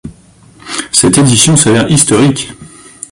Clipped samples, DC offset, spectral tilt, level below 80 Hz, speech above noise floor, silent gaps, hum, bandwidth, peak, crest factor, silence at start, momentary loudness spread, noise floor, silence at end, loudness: 0.4%; under 0.1%; -4 dB/octave; -40 dBFS; 33 dB; none; none; 16 kHz; 0 dBFS; 10 dB; 0.05 s; 14 LU; -41 dBFS; 0.45 s; -8 LUFS